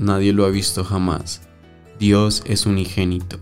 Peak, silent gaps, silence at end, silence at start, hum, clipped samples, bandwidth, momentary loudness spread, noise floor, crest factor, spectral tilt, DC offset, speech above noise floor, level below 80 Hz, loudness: -2 dBFS; none; 0 s; 0 s; none; under 0.1%; 16 kHz; 8 LU; -44 dBFS; 16 dB; -5.5 dB/octave; 0.9%; 26 dB; -40 dBFS; -19 LUFS